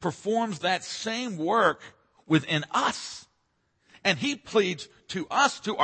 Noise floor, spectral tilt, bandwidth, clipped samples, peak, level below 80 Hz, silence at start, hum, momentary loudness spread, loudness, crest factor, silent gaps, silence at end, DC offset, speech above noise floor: -73 dBFS; -4 dB/octave; 8.8 kHz; under 0.1%; -8 dBFS; -68 dBFS; 0 s; none; 12 LU; -27 LUFS; 20 dB; none; 0 s; under 0.1%; 46 dB